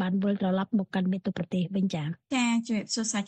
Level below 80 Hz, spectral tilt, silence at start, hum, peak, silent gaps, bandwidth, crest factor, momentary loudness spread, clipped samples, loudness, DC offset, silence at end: -68 dBFS; -5 dB/octave; 0 s; none; -16 dBFS; none; 9 kHz; 12 dB; 4 LU; under 0.1%; -29 LUFS; under 0.1%; 0 s